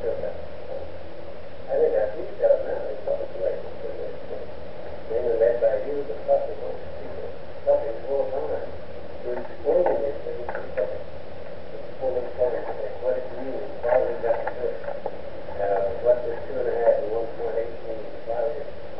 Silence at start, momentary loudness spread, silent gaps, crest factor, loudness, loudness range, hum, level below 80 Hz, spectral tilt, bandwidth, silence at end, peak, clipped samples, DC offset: 0 s; 16 LU; none; 18 dB; -27 LUFS; 3 LU; none; -52 dBFS; -5 dB/octave; 5.6 kHz; 0 s; -8 dBFS; under 0.1%; 4%